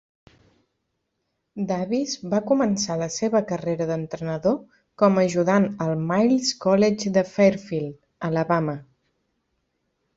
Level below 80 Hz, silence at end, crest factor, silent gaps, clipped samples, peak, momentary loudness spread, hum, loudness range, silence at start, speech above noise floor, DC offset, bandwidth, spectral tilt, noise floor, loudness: -62 dBFS; 1.35 s; 20 dB; none; under 0.1%; -4 dBFS; 10 LU; none; 5 LU; 1.55 s; 55 dB; under 0.1%; 8 kHz; -5.5 dB/octave; -77 dBFS; -23 LUFS